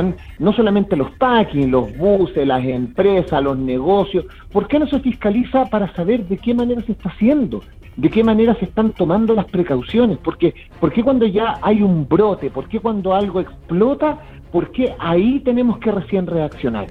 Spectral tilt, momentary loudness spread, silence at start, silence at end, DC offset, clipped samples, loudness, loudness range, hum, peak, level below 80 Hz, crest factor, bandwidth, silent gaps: -9.5 dB/octave; 7 LU; 0 s; 0 s; under 0.1%; under 0.1%; -17 LUFS; 2 LU; none; 0 dBFS; -38 dBFS; 16 dB; 4.6 kHz; none